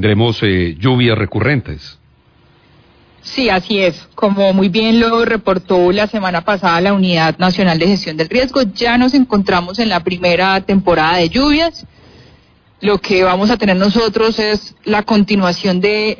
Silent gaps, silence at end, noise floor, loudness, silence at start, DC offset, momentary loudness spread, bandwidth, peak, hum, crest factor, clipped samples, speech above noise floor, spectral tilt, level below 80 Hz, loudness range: none; 0.05 s; -50 dBFS; -13 LUFS; 0 s; under 0.1%; 5 LU; 5.4 kHz; -2 dBFS; none; 12 dB; under 0.1%; 37 dB; -6.5 dB/octave; -38 dBFS; 4 LU